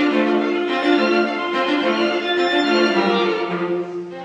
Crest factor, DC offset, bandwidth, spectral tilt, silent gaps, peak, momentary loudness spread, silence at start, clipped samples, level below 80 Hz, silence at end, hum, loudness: 14 dB; under 0.1%; 8.6 kHz; -5 dB/octave; none; -4 dBFS; 6 LU; 0 s; under 0.1%; -70 dBFS; 0 s; none; -18 LUFS